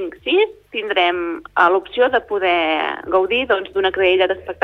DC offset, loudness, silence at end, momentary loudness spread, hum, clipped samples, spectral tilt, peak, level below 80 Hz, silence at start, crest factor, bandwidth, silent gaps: under 0.1%; -18 LUFS; 0.1 s; 6 LU; none; under 0.1%; -5.5 dB/octave; -2 dBFS; -52 dBFS; 0 s; 16 dB; 5.6 kHz; none